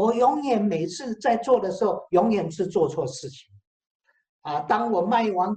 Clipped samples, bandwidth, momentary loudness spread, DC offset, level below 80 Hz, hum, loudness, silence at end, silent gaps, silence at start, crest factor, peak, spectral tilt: under 0.1%; 9 kHz; 10 LU; under 0.1%; -64 dBFS; none; -24 LUFS; 0 s; 3.67-3.80 s, 3.86-4.00 s, 4.29-4.42 s; 0 s; 16 dB; -6 dBFS; -6 dB/octave